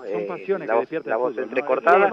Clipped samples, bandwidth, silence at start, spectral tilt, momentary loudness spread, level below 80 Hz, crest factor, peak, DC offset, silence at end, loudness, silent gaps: under 0.1%; 7 kHz; 0 s; -7 dB/octave; 10 LU; -74 dBFS; 18 dB; -4 dBFS; under 0.1%; 0 s; -23 LUFS; none